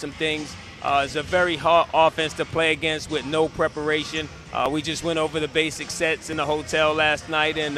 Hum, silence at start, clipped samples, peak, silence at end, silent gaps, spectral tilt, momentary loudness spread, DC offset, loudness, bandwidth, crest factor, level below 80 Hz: none; 0 s; under 0.1%; -4 dBFS; 0 s; none; -3.5 dB/octave; 7 LU; under 0.1%; -23 LUFS; 14 kHz; 18 dB; -48 dBFS